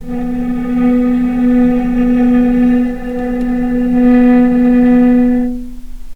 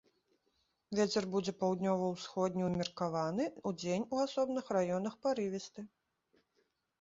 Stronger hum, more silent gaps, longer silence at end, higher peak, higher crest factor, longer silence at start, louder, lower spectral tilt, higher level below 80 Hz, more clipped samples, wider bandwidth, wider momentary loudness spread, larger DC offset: neither; neither; second, 0 s vs 1.15 s; first, 0 dBFS vs -20 dBFS; second, 10 dB vs 18 dB; second, 0 s vs 0.9 s; first, -12 LUFS vs -36 LUFS; first, -8.5 dB/octave vs -5.5 dB/octave; first, -28 dBFS vs -72 dBFS; neither; second, 4.1 kHz vs 7.6 kHz; first, 10 LU vs 7 LU; neither